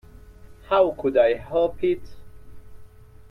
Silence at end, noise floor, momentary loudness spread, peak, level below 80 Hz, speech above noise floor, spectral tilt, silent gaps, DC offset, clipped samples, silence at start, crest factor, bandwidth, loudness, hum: 0.45 s; -45 dBFS; 6 LU; -6 dBFS; -48 dBFS; 24 dB; -7.5 dB/octave; none; under 0.1%; under 0.1%; 0.3 s; 18 dB; 5.8 kHz; -22 LUFS; none